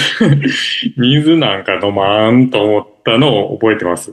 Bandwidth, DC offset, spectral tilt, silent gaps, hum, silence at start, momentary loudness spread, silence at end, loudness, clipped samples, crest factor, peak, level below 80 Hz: 12.5 kHz; under 0.1%; -6 dB/octave; none; none; 0 s; 5 LU; 0 s; -12 LUFS; under 0.1%; 12 dB; 0 dBFS; -52 dBFS